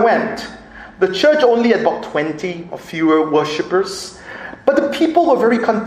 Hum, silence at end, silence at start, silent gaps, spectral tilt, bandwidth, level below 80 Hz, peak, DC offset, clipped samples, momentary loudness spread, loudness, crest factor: none; 0 s; 0 s; none; -5 dB/octave; 14 kHz; -52 dBFS; 0 dBFS; under 0.1%; under 0.1%; 16 LU; -16 LUFS; 16 dB